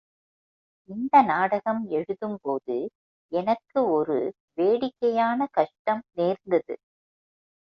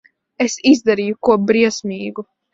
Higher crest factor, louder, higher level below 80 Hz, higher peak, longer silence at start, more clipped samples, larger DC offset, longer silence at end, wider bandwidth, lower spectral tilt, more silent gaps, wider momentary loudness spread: about the same, 20 dB vs 16 dB; second, -25 LUFS vs -16 LUFS; second, -72 dBFS vs -58 dBFS; second, -6 dBFS vs 0 dBFS; first, 0.9 s vs 0.4 s; neither; neither; first, 0.95 s vs 0.3 s; second, 6.4 kHz vs 7.8 kHz; first, -8 dB/octave vs -4.5 dB/octave; first, 2.95-3.29 s, 4.40-4.48 s, 5.79-5.85 s vs none; about the same, 11 LU vs 13 LU